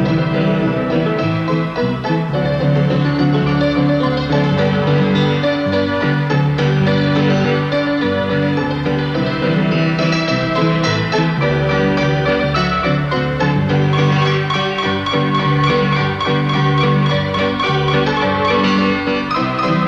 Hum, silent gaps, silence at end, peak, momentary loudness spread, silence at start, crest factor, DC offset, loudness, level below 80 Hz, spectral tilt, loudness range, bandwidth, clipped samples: none; none; 0 s; -2 dBFS; 3 LU; 0 s; 12 dB; under 0.1%; -16 LUFS; -40 dBFS; -7 dB/octave; 1 LU; 7.4 kHz; under 0.1%